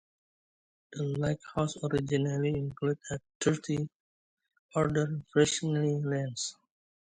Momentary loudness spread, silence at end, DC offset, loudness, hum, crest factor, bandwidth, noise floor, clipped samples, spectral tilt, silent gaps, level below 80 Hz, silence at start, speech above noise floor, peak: 9 LU; 0.5 s; under 0.1%; -31 LUFS; none; 20 dB; 9.4 kHz; under -90 dBFS; under 0.1%; -5.5 dB/octave; 3.35-3.40 s, 3.95-4.37 s, 4.59-4.69 s; -60 dBFS; 0.9 s; over 60 dB; -12 dBFS